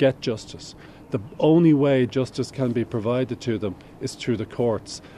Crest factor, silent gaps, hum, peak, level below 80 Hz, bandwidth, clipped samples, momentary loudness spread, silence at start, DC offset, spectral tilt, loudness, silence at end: 18 dB; none; none; -6 dBFS; -54 dBFS; 11.5 kHz; under 0.1%; 16 LU; 0 s; under 0.1%; -7 dB/octave; -23 LUFS; 0 s